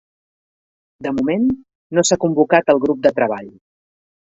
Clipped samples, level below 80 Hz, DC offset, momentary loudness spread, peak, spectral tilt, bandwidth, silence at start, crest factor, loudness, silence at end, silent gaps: under 0.1%; -54 dBFS; under 0.1%; 12 LU; 0 dBFS; -4.5 dB/octave; 8.4 kHz; 1 s; 18 dB; -17 LUFS; 0.85 s; 1.75-1.90 s